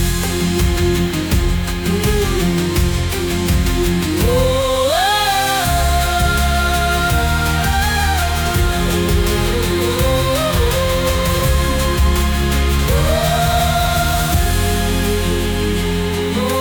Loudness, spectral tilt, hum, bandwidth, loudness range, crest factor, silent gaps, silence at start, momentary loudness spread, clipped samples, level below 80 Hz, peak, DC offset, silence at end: -16 LUFS; -4.5 dB/octave; none; 20 kHz; 2 LU; 12 dB; none; 0 s; 3 LU; under 0.1%; -20 dBFS; -4 dBFS; under 0.1%; 0 s